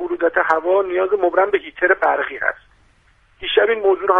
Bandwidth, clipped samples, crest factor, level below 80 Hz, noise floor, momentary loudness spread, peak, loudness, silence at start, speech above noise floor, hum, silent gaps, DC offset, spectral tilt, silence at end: 5.8 kHz; under 0.1%; 18 dB; -54 dBFS; -55 dBFS; 7 LU; 0 dBFS; -18 LUFS; 0 s; 38 dB; none; none; under 0.1%; -5 dB/octave; 0 s